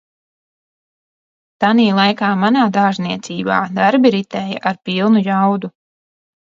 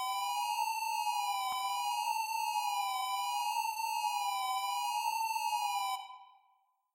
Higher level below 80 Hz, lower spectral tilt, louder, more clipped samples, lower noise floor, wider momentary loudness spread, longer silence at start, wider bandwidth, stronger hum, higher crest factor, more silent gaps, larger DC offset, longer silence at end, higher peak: first, -62 dBFS vs -90 dBFS; first, -6.5 dB/octave vs 4.5 dB/octave; first, -15 LUFS vs -34 LUFS; neither; first, under -90 dBFS vs -73 dBFS; first, 10 LU vs 1 LU; first, 1.6 s vs 0 s; second, 7.4 kHz vs 16 kHz; neither; first, 16 dB vs 10 dB; neither; neither; about the same, 0.8 s vs 0.7 s; first, 0 dBFS vs -24 dBFS